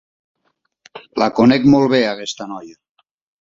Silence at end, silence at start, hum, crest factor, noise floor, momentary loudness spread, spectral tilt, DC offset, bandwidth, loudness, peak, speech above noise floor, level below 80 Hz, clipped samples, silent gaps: 0.7 s; 0.95 s; none; 16 dB; -68 dBFS; 17 LU; -6 dB/octave; under 0.1%; 7.6 kHz; -15 LUFS; -2 dBFS; 53 dB; -54 dBFS; under 0.1%; none